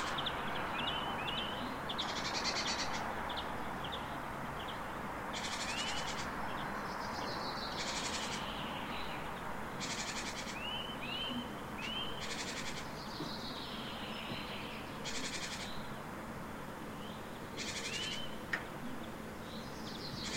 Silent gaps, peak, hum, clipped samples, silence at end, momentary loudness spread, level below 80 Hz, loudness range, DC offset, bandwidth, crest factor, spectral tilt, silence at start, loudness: none; -22 dBFS; none; under 0.1%; 0 s; 8 LU; -58 dBFS; 5 LU; 0.1%; 16 kHz; 18 dB; -3 dB/octave; 0 s; -40 LUFS